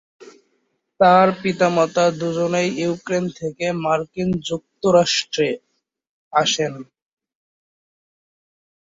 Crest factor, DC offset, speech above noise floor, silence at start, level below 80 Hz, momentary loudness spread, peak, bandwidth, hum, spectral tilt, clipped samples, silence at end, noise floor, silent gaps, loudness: 18 dB; under 0.1%; 51 dB; 0.2 s; -60 dBFS; 10 LU; -2 dBFS; 8 kHz; none; -4.5 dB/octave; under 0.1%; 2 s; -69 dBFS; 6.09-6.31 s; -19 LUFS